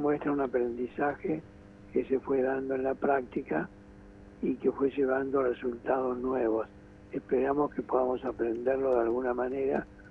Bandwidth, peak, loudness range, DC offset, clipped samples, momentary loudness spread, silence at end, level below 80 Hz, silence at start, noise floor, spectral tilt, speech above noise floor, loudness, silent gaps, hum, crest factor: 4 kHz; -14 dBFS; 2 LU; under 0.1%; under 0.1%; 7 LU; 0 s; -58 dBFS; 0 s; -51 dBFS; -9 dB/octave; 21 dB; -31 LUFS; none; none; 18 dB